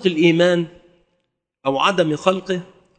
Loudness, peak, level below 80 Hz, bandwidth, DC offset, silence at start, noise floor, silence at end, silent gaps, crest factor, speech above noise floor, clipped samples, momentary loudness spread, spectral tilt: -18 LUFS; 0 dBFS; -64 dBFS; 9 kHz; under 0.1%; 0 s; -73 dBFS; 0.35 s; none; 20 dB; 55 dB; under 0.1%; 12 LU; -5.5 dB/octave